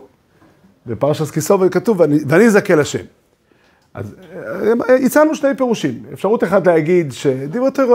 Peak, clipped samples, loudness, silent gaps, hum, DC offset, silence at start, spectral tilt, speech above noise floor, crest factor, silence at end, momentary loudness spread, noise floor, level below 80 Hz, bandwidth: 0 dBFS; under 0.1%; -15 LUFS; none; none; under 0.1%; 0.85 s; -6 dB/octave; 41 dB; 16 dB; 0 s; 16 LU; -55 dBFS; -58 dBFS; 16 kHz